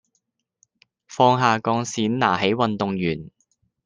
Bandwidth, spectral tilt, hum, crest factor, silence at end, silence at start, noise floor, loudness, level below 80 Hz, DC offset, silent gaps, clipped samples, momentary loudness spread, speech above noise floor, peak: 10 kHz; -5 dB/octave; none; 20 dB; 0.55 s; 1.1 s; -74 dBFS; -21 LUFS; -62 dBFS; under 0.1%; none; under 0.1%; 9 LU; 53 dB; -2 dBFS